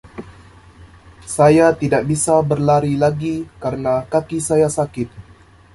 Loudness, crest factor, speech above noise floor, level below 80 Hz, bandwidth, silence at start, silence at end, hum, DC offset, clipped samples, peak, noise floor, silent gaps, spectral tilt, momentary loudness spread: -17 LUFS; 16 dB; 27 dB; -46 dBFS; 12 kHz; 0.05 s; 0.55 s; none; under 0.1%; under 0.1%; -2 dBFS; -43 dBFS; none; -6 dB/octave; 14 LU